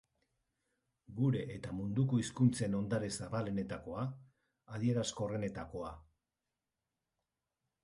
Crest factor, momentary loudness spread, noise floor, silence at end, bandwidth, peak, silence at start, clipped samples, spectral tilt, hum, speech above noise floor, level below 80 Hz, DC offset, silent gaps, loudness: 20 dB; 13 LU; -90 dBFS; 1.85 s; 11.5 kHz; -18 dBFS; 1.1 s; under 0.1%; -6.5 dB/octave; none; 54 dB; -64 dBFS; under 0.1%; none; -37 LUFS